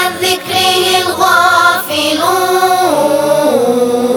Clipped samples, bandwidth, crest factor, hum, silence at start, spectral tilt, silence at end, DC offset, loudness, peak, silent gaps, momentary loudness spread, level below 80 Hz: 0.1%; over 20 kHz; 10 dB; none; 0 s; -2.5 dB/octave; 0 s; under 0.1%; -10 LUFS; 0 dBFS; none; 4 LU; -56 dBFS